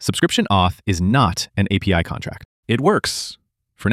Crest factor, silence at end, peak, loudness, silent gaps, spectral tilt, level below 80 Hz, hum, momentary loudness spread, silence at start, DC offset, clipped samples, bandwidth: 16 dB; 0 s; -2 dBFS; -19 LUFS; 2.45-2.63 s; -5 dB/octave; -40 dBFS; none; 13 LU; 0 s; under 0.1%; under 0.1%; 15.5 kHz